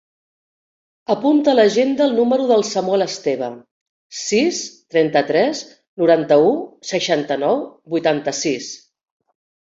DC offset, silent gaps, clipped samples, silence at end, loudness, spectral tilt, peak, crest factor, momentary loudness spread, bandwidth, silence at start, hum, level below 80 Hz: under 0.1%; 3.71-4.10 s, 5.88-5.97 s; under 0.1%; 1 s; -18 LUFS; -4 dB/octave; -2 dBFS; 16 dB; 13 LU; 7.8 kHz; 1.1 s; none; -64 dBFS